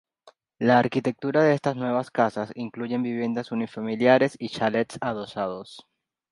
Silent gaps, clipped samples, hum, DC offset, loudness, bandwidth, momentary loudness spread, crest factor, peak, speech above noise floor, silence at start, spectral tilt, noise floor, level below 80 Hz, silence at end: none; under 0.1%; none; under 0.1%; -25 LUFS; 11 kHz; 11 LU; 22 dB; -4 dBFS; 33 dB; 0.25 s; -6.5 dB/octave; -58 dBFS; -68 dBFS; 0.5 s